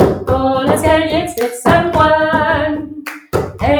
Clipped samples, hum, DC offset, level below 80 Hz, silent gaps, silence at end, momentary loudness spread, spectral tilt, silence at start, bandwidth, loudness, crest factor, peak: under 0.1%; none; under 0.1%; -34 dBFS; none; 0 s; 9 LU; -5.5 dB/octave; 0 s; over 20 kHz; -14 LUFS; 14 dB; 0 dBFS